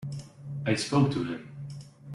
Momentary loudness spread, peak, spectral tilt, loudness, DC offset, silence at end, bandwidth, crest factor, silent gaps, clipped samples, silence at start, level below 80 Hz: 17 LU; -10 dBFS; -6 dB/octave; -29 LUFS; under 0.1%; 0 s; 11.5 kHz; 20 dB; none; under 0.1%; 0 s; -60 dBFS